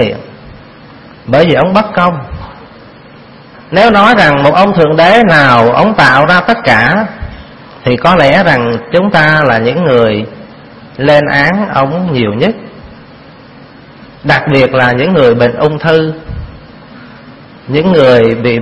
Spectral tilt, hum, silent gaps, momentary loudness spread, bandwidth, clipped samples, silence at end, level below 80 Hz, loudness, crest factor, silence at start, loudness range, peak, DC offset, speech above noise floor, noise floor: -7 dB/octave; none; none; 16 LU; 11 kHz; 1%; 0 s; -36 dBFS; -8 LUFS; 10 dB; 0 s; 7 LU; 0 dBFS; under 0.1%; 27 dB; -34 dBFS